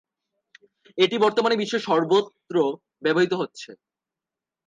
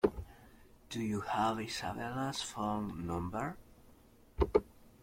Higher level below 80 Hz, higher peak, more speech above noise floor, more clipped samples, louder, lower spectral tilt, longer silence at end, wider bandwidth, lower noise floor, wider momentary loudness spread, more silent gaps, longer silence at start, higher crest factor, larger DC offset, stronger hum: second, -78 dBFS vs -50 dBFS; first, -6 dBFS vs -14 dBFS; first, 66 dB vs 24 dB; neither; first, -23 LUFS vs -37 LUFS; about the same, -5 dB/octave vs -5.5 dB/octave; first, 0.9 s vs 0.15 s; second, 9.4 kHz vs 16.5 kHz; first, -89 dBFS vs -61 dBFS; about the same, 13 LU vs 13 LU; neither; first, 0.95 s vs 0.05 s; about the same, 20 dB vs 24 dB; neither; neither